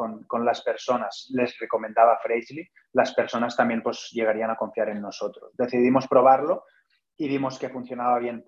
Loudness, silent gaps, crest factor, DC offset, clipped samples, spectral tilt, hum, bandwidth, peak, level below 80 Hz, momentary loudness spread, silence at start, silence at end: -24 LUFS; none; 20 dB; under 0.1%; under 0.1%; -5.5 dB/octave; none; 7.6 kHz; -4 dBFS; -70 dBFS; 13 LU; 0 s; 0.05 s